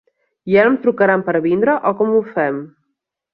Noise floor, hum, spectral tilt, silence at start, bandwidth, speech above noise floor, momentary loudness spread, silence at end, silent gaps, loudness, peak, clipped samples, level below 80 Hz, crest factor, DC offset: -75 dBFS; none; -10 dB/octave; 0.45 s; 5.4 kHz; 59 dB; 7 LU; 0.65 s; none; -16 LUFS; -2 dBFS; under 0.1%; -62 dBFS; 16 dB; under 0.1%